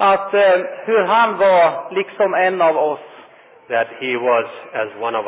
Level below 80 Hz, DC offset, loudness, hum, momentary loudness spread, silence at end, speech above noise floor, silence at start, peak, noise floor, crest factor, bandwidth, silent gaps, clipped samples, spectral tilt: -68 dBFS; under 0.1%; -17 LUFS; none; 10 LU; 0 s; 28 dB; 0 s; -4 dBFS; -44 dBFS; 12 dB; 4 kHz; none; under 0.1%; -8 dB/octave